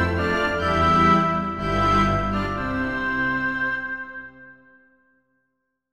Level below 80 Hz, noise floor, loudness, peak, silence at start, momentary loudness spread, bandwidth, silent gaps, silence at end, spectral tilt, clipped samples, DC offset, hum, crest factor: -38 dBFS; -76 dBFS; -21 LUFS; -6 dBFS; 0 s; 13 LU; 13 kHz; none; 1.4 s; -6.5 dB/octave; under 0.1%; under 0.1%; none; 16 dB